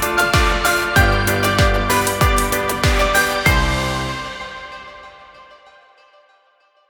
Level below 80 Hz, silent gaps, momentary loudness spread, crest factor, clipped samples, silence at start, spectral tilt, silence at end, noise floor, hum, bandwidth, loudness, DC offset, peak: -26 dBFS; none; 15 LU; 18 dB; under 0.1%; 0 s; -4 dB/octave; 1.45 s; -57 dBFS; none; 19 kHz; -16 LUFS; under 0.1%; -2 dBFS